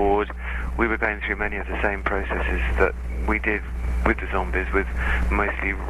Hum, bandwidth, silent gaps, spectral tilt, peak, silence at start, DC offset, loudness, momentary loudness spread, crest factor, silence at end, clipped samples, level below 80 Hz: none; 10.5 kHz; none; -7.5 dB/octave; -4 dBFS; 0 s; under 0.1%; -24 LUFS; 5 LU; 18 dB; 0 s; under 0.1%; -28 dBFS